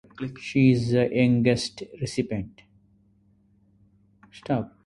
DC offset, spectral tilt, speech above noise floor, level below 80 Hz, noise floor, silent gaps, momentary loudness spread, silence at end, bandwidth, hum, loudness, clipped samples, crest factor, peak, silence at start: under 0.1%; -6.5 dB/octave; 38 dB; -54 dBFS; -62 dBFS; none; 15 LU; 0.2 s; 11.5 kHz; none; -24 LUFS; under 0.1%; 18 dB; -8 dBFS; 0.2 s